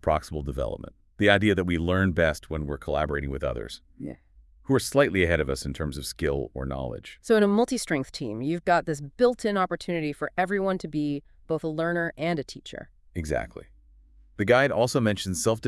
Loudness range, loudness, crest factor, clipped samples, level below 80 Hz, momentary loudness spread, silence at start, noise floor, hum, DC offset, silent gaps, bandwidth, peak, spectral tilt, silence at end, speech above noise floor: 4 LU; -26 LUFS; 22 dB; under 0.1%; -44 dBFS; 17 LU; 0.05 s; -55 dBFS; none; under 0.1%; none; 12 kHz; -4 dBFS; -5.5 dB/octave; 0 s; 29 dB